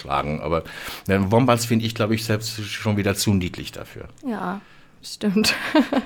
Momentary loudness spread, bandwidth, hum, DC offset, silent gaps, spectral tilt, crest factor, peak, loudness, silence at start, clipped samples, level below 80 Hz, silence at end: 16 LU; 20 kHz; none; under 0.1%; none; -5 dB/octave; 20 dB; -2 dBFS; -22 LUFS; 0 s; under 0.1%; -48 dBFS; 0 s